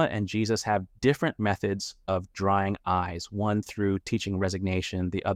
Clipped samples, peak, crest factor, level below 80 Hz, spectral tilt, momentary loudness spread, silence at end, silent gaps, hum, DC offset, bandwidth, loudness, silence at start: under 0.1%; -10 dBFS; 18 dB; -54 dBFS; -6 dB/octave; 5 LU; 0 s; none; none; under 0.1%; 15 kHz; -28 LUFS; 0 s